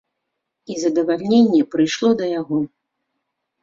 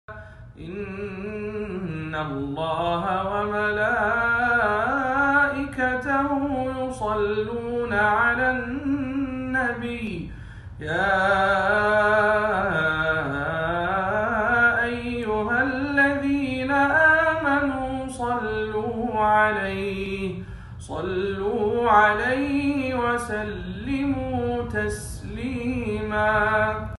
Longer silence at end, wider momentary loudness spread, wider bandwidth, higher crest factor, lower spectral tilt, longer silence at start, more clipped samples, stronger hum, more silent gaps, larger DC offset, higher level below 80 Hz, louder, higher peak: first, 0.95 s vs 0.05 s; second, 9 LU vs 12 LU; second, 7.6 kHz vs 12 kHz; about the same, 16 dB vs 18 dB; about the same, -5.5 dB/octave vs -6 dB/octave; first, 0.7 s vs 0.1 s; neither; neither; neither; neither; second, -64 dBFS vs -44 dBFS; first, -18 LUFS vs -23 LUFS; about the same, -4 dBFS vs -6 dBFS